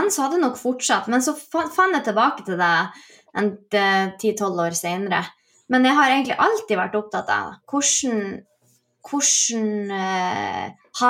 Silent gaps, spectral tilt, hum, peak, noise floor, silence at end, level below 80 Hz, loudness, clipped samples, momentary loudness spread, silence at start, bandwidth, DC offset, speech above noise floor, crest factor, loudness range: none; -2.5 dB/octave; none; -4 dBFS; -63 dBFS; 0 s; -70 dBFS; -21 LUFS; under 0.1%; 10 LU; 0 s; 17 kHz; under 0.1%; 42 dB; 18 dB; 2 LU